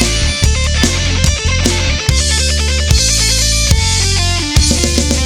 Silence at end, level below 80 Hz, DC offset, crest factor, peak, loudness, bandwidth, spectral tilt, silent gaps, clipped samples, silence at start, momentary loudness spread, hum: 0 s; -16 dBFS; under 0.1%; 12 dB; 0 dBFS; -12 LUFS; 18.5 kHz; -3 dB/octave; none; under 0.1%; 0 s; 3 LU; none